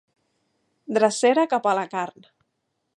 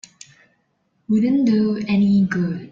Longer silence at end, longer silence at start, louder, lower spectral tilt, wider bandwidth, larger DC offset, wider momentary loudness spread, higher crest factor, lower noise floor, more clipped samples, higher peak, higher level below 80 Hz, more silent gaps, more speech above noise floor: first, 0.9 s vs 0.05 s; second, 0.9 s vs 1.1 s; second, -22 LUFS vs -18 LUFS; second, -4 dB/octave vs -7.5 dB/octave; first, 11.5 kHz vs 7.6 kHz; neither; first, 11 LU vs 5 LU; first, 20 dB vs 12 dB; first, -76 dBFS vs -67 dBFS; neither; first, -4 dBFS vs -8 dBFS; second, -82 dBFS vs -58 dBFS; neither; first, 55 dB vs 50 dB